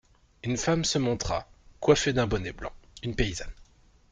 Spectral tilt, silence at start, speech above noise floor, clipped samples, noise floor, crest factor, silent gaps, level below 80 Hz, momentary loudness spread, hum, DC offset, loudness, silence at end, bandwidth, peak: -4.5 dB/octave; 0.45 s; 30 dB; under 0.1%; -57 dBFS; 22 dB; none; -42 dBFS; 15 LU; none; under 0.1%; -28 LUFS; 0.5 s; 9.6 kHz; -8 dBFS